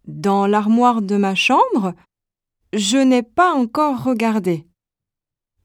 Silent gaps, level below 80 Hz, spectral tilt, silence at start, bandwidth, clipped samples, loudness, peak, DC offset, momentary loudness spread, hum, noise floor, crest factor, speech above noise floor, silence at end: none; -60 dBFS; -5 dB/octave; 0.05 s; 15.5 kHz; under 0.1%; -17 LUFS; -4 dBFS; under 0.1%; 7 LU; none; -85 dBFS; 14 dB; 69 dB; 1.05 s